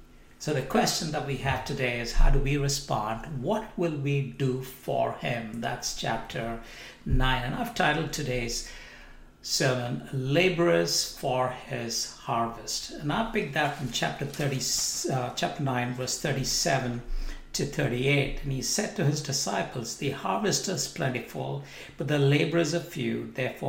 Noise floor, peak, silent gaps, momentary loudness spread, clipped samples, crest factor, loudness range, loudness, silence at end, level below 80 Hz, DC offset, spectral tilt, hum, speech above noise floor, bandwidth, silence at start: -49 dBFS; -10 dBFS; none; 9 LU; under 0.1%; 20 dB; 3 LU; -28 LUFS; 0 s; -36 dBFS; under 0.1%; -4 dB/octave; none; 21 dB; 16.5 kHz; 0 s